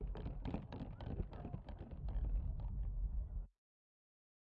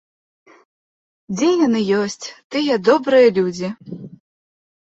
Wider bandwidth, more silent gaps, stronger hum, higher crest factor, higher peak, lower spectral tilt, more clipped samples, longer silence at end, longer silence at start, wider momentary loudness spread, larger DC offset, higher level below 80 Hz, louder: second, 4.7 kHz vs 8 kHz; second, none vs 2.44-2.50 s; neither; about the same, 16 dB vs 18 dB; second, -30 dBFS vs -2 dBFS; first, -8.5 dB/octave vs -5 dB/octave; neither; first, 0.95 s vs 0.75 s; second, 0 s vs 1.3 s; second, 7 LU vs 18 LU; neither; first, -46 dBFS vs -64 dBFS; second, -47 LUFS vs -17 LUFS